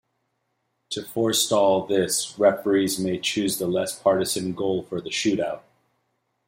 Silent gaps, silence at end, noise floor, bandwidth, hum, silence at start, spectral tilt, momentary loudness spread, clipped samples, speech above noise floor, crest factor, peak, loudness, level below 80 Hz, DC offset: none; 0.9 s; -74 dBFS; 16.5 kHz; none; 0.9 s; -3.5 dB/octave; 9 LU; under 0.1%; 51 dB; 18 dB; -6 dBFS; -23 LUFS; -64 dBFS; under 0.1%